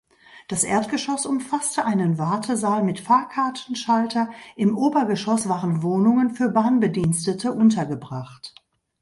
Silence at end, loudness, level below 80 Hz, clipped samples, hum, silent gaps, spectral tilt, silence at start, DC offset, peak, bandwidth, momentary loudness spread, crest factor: 0.5 s; -22 LUFS; -58 dBFS; under 0.1%; none; none; -5.5 dB/octave; 0.35 s; under 0.1%; -6 dBFS; 11.5 kHz; 10 LU; 16 dB